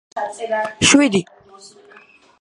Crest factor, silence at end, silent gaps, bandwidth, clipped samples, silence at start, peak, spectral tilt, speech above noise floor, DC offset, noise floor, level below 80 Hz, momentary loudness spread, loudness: 20 dB; 0.75 s; none; 11.5 kHz; under 0.1%; 0.15 s; 0 dBFS; -3 dB/octave; 31 dB; under 0.1%; -48 dBFS; -50 dBFS; 14 LU; -16 LUFS